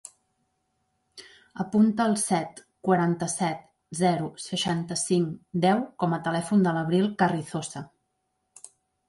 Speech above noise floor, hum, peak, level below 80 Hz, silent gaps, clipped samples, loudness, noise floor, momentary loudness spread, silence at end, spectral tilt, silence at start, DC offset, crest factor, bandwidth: 52 dB; none; -10 dBFS; -66 dBFS; none; under 0.1%; -26 LUFS; -77 dBFS; 12 LU; 1.25 s; -5 dB/octave; 1.15 s; under 0.1%; 18 dB; 11.5 kHz